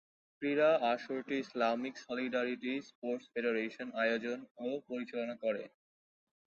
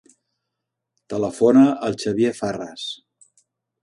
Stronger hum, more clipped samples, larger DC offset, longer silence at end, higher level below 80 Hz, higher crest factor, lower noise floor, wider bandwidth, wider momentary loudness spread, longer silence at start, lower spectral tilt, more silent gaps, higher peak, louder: neither; neither; neither; about the same, 0.8 s vs 0.9 s; second, -84 dBFS vs -62 dBFS; about the same, 18 dB vs 18 dB; first, under -90 dBFS vs -81 dBFS; second, 7.2 kHz vs 11.5 kHz; second, 10 LU vs 17 LU; second, 0.4 s vs 1.1 s; second, -2.5 dB/octave vs -6 dB/octave; first, 2.95-3.02 s, 4.51-4.55 s vs none; second, -18 dBFS vs -4 dBFS; second, -36 LUFS vs -20 LUFS